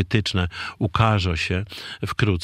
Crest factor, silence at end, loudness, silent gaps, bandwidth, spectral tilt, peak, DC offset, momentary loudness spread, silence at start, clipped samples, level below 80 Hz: 20 dB; 0 s; -23 LUFS; none; 12.5 kHz; -6 dB/octave; -2 dBFS; under 0.1%; 9 LU; 0 s; under 0.1%; -42 dBFS